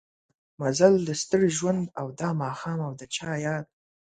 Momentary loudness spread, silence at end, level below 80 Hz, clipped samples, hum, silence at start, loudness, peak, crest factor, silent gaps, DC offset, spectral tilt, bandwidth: 12 LU; 0.5 s; -64 dBFS; under 0.1%; none; 0.6 s; -26 LUFS; -6 dBFS; 22 dB; none; under 0.1%; -5 dB/octave; 9.4 kHz